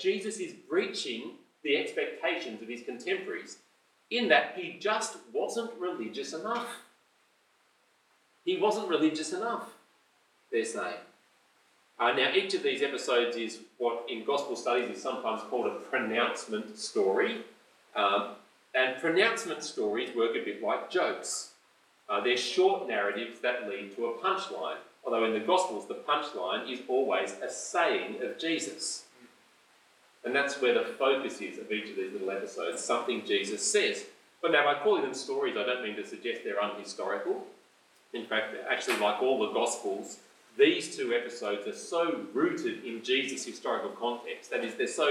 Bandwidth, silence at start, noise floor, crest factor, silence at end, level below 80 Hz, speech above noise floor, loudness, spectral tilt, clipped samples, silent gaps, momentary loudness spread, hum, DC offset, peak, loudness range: 13.5 kHz; 0 s; -69 dBFS; 22 dB; 0 s; under -90 dBFS; 38 dB; -31 LUFS; -2.5 dB/octave; under 0.1%; none; 11 LU; none; under 0.1%; -8 dBFS; 4 LU